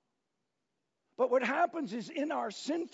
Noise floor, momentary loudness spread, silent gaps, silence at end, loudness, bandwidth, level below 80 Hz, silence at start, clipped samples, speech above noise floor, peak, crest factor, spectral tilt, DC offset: -85 dBFS; 8 LU; none; 0.05 s; -33 LUFS; 7.6 kHz; under -90 dBFS; 1.2 s; under 0.1%; 52 dB; -18 dBFS; 18 dB; -2.5 dB/octave; under 0.1%